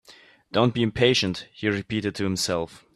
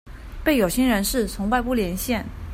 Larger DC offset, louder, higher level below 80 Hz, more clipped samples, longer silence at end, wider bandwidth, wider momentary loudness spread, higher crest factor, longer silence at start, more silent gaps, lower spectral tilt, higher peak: neither; about the same, -24 LUFS vs -22 LUFS; second, -54 dBFS vs -36 dBFS; neither; first, 0.2 s vs 0 s; second, 14 kHz vs 16.5 kHz; about the same, 8 LU vs 7 LU; about the same, 20 dB vs 16 dB; about the same, 0.1 s vs 0.05 s; neither; about the same, -4.5 dB/octave vs -4.5 dB/octave; about the same, -4 dBFS vs -6 dBFS